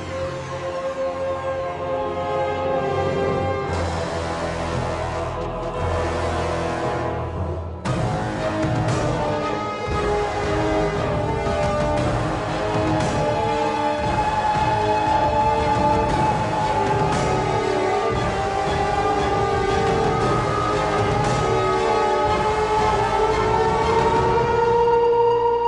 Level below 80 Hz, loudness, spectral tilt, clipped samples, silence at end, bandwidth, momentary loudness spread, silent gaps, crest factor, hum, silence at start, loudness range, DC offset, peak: -36 dBFS; -21 LUFS; -6 dB/octave; under 0.1%; 0 s; 11 kHz; 7 LU; none; 14 dB; none; 0 s; 5 LU; under 0.1%; -8 dBFS